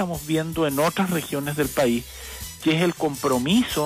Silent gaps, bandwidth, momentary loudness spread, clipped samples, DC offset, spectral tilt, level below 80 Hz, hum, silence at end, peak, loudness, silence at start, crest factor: none; 16 kHz; 7 LU; under 0.1%; under 0.1%; -5 dB/octave; -46 dBFS; none; 0 s; -10 dBFS; -23 LUFS; 0 s; 14 dB